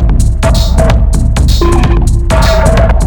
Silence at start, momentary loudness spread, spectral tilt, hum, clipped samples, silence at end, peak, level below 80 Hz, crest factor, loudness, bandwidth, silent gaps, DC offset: 0 s; 3 LU; -6 dB/octave; none; under 0.1%; 0 s; 0 dBFS; -8 dBFS; 6 dB; -10 LUFS; 19 kHz; none; under 0.1%